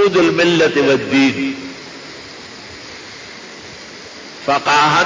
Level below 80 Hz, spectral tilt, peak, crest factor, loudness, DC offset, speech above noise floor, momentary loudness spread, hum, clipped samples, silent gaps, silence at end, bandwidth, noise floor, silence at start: -54 dBFS; -4.5 dB/octave; -4 dBFS; 12 dB; -14 LUFS; under 0.1%; 21 dB; 20 LU; none; under 0.1%; none; 0 s; 7.6 kHz; -34 dBFS; 0 s